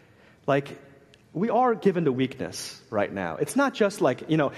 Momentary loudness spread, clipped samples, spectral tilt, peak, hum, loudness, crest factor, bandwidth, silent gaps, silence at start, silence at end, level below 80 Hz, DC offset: 11 LU; under 0.1%; -6 dB/octave; -10 dBFS; none; -26 LUFS; 18 dB; 13 kHz; none; 0.45 s; 0 s; -66 dBFS; under 0.1%